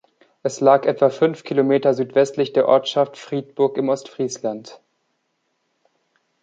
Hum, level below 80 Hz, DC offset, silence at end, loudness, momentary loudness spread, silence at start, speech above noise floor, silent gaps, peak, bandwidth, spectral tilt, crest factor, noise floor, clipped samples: none; -72 dBFS; under 0.1%; 1.65 s; -19 LUFS; 12 LU; 0.45 s; 52 dB; none; -2 dBFS; 8.8 kHz; -5.5 dB/octave; 18 dB; -71 dBFS; under 0.1%